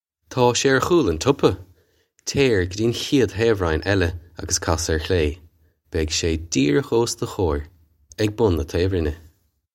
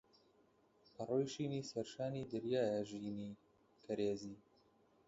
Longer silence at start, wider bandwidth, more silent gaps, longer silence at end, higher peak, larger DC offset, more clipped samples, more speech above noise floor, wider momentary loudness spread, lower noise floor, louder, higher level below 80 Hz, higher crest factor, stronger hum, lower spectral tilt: second, 0.3 s vs 1 s; first, 16.5 kHz vs 7.6 kHz; neither; about the same, 0.55 s vs 0.65 s; first, -2 dBFS vs -26 dBFS; neither; neither; first, 41 dB vs 32 dB; second, 10 LU vs 14 LU; second, -62 dBFS vs -73 dBFS; first, -21 LUFS vs -42 LUFS; first, -36 dBFS vs -76 dBFS; about the same, 20 dB vs 18 dB; neither; second, -4.5 dB/octave vs -6.5 dB/octave